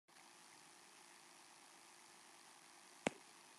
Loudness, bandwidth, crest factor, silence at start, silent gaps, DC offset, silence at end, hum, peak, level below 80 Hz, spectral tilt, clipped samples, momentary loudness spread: -55 LUFS; 13 kHz; 34 dB; 0.1 s; none; under 0.1%; 0 s; none; -22 dBFS; under -90 dBFS; -3 dB/octave; under 0.1%; 15 LU